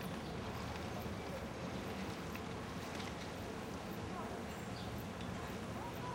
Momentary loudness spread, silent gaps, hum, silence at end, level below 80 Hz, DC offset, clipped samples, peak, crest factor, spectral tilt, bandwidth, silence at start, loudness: 1 LU; none; none; 0 s; -58 dBFS; under 0.1%; under 0.1%; -30 dBFS; 14 dB; -5.5 dB/octave; 16.5 kHz; 0 s; -45 LUFS